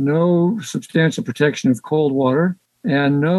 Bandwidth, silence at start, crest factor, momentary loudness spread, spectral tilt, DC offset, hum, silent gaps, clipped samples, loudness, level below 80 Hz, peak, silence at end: 12.5 kHz; 0 s; 16 dB; 6 LU; -6.5 dB/octave; under 0.1%; none; none; under 0.1%; -18 LUFS; -66 dBFS; -2 dBFS; 0 s